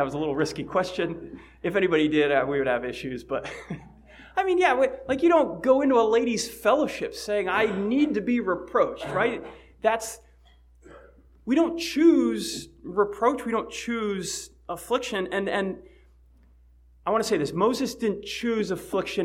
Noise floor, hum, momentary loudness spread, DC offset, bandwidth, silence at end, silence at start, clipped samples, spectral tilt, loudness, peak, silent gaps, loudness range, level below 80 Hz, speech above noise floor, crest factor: -56 dBFS; none; 13 LU; under 0.1%; 16 kHz; 0 s; 0 s; under 0.1%; -4.5 dB/octave; -25 LUFS; -8 dBFS; none; 6 LU; -54 dBFS; 31 dB; 18 dB